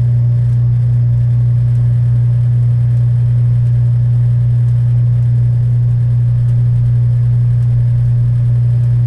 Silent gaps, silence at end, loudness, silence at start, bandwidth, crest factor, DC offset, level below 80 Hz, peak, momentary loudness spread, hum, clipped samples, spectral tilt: none; 0 s; -12 LUFS; 0 s; 1.9 kHz; 6 dB; under 0.1%; -30 dBFS; -6 dBFS; 0 LU; 60 Hz at -10 dBFS; under 0.1%; -10.5 dB/octave